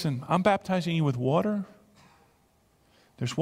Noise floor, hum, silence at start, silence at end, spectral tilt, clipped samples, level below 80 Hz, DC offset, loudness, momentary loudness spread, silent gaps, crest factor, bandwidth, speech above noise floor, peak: -65 dBFS; none; 0 s; 0 s; -7 dB/octave; under 0.1%; -64 dBFS; under 0.1%; -27 LUFS; 10 LU; none; 20 dB; 14 kHz; 39 dB; -8 dBFS